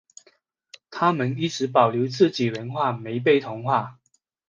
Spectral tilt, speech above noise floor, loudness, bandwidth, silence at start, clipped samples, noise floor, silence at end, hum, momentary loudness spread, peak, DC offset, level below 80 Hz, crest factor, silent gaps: -6 dB/octave; 40 dB; -23 LUFS; 7.6 kHz; 0.9 s; under 0.1%; -62 dBFS; 0.6 s; none; 6 LU; -2 dBFS; under 0.1%; -70 dBFS; 22 dB; none